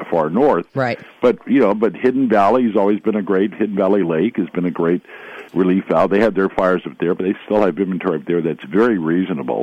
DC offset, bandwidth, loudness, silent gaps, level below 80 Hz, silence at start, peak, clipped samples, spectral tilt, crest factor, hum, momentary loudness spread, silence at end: under 0.1%; 8.6 kHz; -17 LUFS; none; -54 dBFS; 0 s; -4 dBFS; under 0.1%; -8.5 dB/octave; 12 dB; none; 7 LU; 0 s